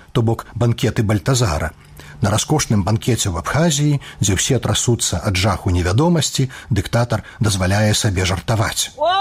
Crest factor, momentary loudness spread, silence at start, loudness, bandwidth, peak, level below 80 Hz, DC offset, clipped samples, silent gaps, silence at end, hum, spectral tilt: 12 dB; 4 LU; 0.15 s; -18 LUFS; 16 kHz; -6 dBFS; -36 dBFS; under 0.1%; under 0.1%; none; 0 s; none; -4.5 dB/octave